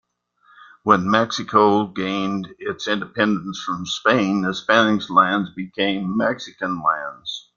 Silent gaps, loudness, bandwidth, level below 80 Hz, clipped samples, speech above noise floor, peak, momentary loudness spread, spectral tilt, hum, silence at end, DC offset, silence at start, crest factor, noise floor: none; -20 LUFS; 7.4 kHz; -60 dBFS; under 0.1%; 38 dB; -2 dBFS; 11 LU; -5 dB/octave; none; 0.15 s; under 0.1%; 0.6 s; 18 dB; -58 dBFS